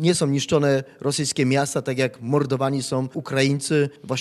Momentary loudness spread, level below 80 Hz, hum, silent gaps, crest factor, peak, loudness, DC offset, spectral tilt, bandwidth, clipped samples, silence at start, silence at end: 5 LU; -62 dBFS; none; none; 18 dB; -4 dBFS; -22 LUFS; under 0.1%; -5 dB/octave; 13.5 kHz; under 0.1%; 0 s; 0 s